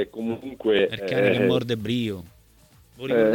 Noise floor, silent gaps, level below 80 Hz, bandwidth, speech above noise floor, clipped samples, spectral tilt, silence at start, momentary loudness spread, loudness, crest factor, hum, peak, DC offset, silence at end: -55 dBFS; none; -58 dBFS; 17.5 kHz; 32 dB; under 0.1%; -6.5 dB/octave; 0 s; 10 LU; -24 LUFS; 16 dB; none; -8 dBFS; under 0.1%; 0 s